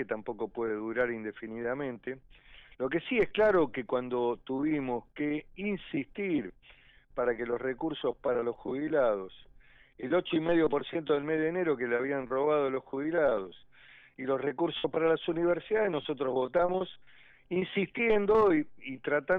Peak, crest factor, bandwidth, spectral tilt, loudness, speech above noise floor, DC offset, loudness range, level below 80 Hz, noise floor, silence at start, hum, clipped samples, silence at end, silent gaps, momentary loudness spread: -16 dBFS; 14 dB; 4.7 kHz; -4 dB/octave; -31 LUFS; 28 dB; under 0.1%; 4 LU; -60 dBFS; -58 dBFS; 0 s; none; under 0.1%; 0 s; none; 10 LU